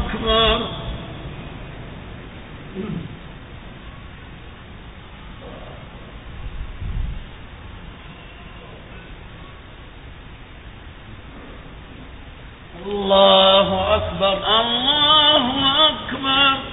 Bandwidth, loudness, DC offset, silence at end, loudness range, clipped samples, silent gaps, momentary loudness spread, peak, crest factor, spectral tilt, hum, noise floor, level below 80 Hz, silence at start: 4 kHz; -16 LUFS; under 0.1%; 0 s; 25 LU; under 0.1%; none; 26 LU; 0 dBFS; 22 dB; -9 dB/octave; none; -39 dBFS; -36 dBFS; 0 s